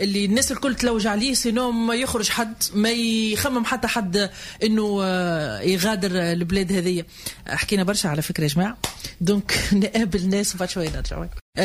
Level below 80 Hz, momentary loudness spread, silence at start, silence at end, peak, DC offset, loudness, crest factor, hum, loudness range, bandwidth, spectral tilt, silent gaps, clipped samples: -40 dBFS; 7 LU; 0 s; 0 s; -8 dBFS; under 0.1%; -22 LUFS; 16 dB; none; 2 LU; 16 kHz; -4 dB/octave; 11.41-11.53 s; under 0.1%